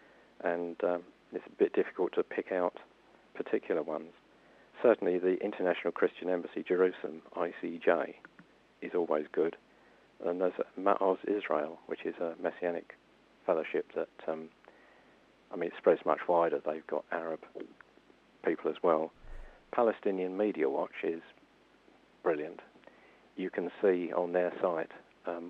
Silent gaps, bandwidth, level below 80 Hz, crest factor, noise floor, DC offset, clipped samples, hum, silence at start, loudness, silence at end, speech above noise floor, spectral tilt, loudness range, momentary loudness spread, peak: none; 5.8 kHz; -64 dBFS; 22 dB; -64 dBFS; under 0.1%; under 0.1%; none; 0.4 s; -33 LUFS; 0 s; 32 dB; -8 dB/octave; 4 LU; 14 LU; -12 dBFS